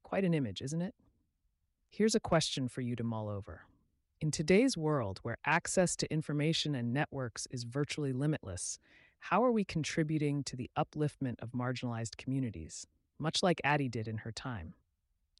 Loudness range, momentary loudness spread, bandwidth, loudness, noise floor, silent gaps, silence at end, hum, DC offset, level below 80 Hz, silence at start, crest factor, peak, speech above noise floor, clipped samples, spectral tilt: 4 LU; 12 LU; 11.5 kHz; -34 LUFS; -80 dBFS; none; 0.7 s; none; under 0.1%; -62 dBFS; 0.1 s; 18 dB; -18 dBFS; 46 dB; under 0.1%; -5 dB/octave